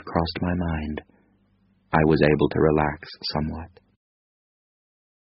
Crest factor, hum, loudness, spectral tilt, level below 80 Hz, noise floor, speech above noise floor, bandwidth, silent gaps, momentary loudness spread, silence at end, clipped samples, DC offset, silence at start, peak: 22 dB; none; -23 LUFS; -5.5 dB/octave; -42 dBFS; -64 dBFS; 41 dB; 5.8 kHz; none; 13 LU; 1.55 s; under 0.1%; under 0.1%; 0.05 s; -2 dBFS